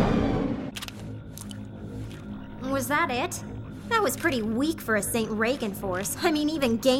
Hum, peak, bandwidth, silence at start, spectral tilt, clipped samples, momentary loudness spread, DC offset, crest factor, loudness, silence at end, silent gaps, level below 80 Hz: none; -10 dBFS; 17.5 kHz; 0 s; -4.5 dB/octave; under 0.1%; 14 LU; under 0.1%; 18 dB; -27 LUFS; 0 s; none; -44 dBFS